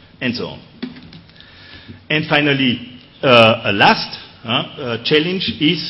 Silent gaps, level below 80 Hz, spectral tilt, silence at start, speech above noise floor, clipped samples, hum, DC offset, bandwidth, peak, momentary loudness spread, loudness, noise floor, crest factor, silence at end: none; -54 dBFS; -6.5 dB/octave; 0.2 s; 26 dB; under 0.1%; none; under 0.1%; 11 kHz; 0 dBFS; 21 LU; -15 LUFS; -42 dBFS; 18 dB; 0 s